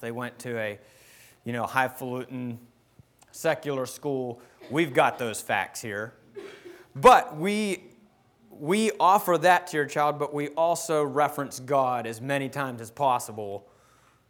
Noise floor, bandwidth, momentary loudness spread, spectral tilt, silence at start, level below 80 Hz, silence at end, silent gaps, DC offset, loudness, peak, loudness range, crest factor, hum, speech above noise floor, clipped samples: -60 dBFS; over 20 kHz; 17 LU; -4.5 dB/octave; 0 s; -62 dBFS; 0.7 s; none; under 0.1%; -26 LUFS; -6 dBFS; 8 LU; 20 dB; none; 35 dB; under 0.1%